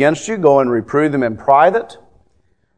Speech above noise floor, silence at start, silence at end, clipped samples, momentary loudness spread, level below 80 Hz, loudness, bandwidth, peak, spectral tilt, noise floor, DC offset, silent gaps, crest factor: 47 dB; 0 s; 0.85 s; under 0.1%; 7 LU; -54 dBFS; -14 LUFS; 10 kHz; 0 dBFS; -6 dB/octave; -61 dBFS; 0.3%; none; 16 dB